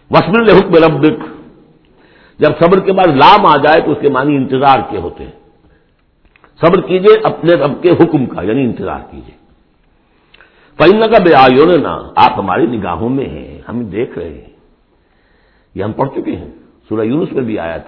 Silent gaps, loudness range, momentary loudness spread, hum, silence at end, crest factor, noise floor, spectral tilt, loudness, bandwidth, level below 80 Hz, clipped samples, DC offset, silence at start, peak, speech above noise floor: none; 12 LU; 16 LU; none; 0.05 s; 12 dB; -53 dBFS; -8.5 dB/octave; -10 LUFS; 5.4 kHz; -40 dBFS; 0.8%; under 0.1%; 0.1 s; 0 dBFS; 43 dB